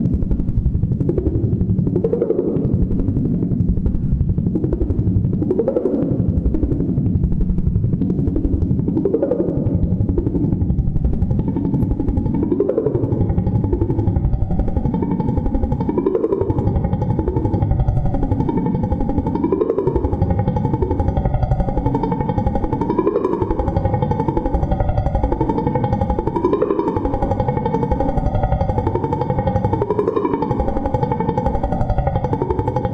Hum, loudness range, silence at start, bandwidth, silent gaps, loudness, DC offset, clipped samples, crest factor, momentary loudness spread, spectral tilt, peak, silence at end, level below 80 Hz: none; 1 LU; 0 s; 5.2 kHz; none; -19 LUFS; under 0.1%; under 0.1%; 14 dB; 2 LU; -11.5 dB/octave; -4 dBFS; 0 s; -24 dBFS